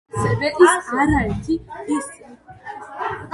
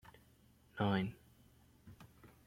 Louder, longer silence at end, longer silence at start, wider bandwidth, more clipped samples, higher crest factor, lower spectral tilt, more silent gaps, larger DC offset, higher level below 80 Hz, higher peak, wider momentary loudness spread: first, -19 LUFS vs -38 LUFS; second, 0 s vs 0.2 s; about the same, 0.15 s vs 0.05 s; second, 11.5 kHz vs 16 kHz; neither; about the same, 20 dB vs 22 dB; second, -5.5 dB/octave vs -7.5 dB/octave; neither; neither; first, -38 dBFS vs -70 dBFS; first, 0 dBFS vs -22 dBFS; second, 20 LU vs 26 LU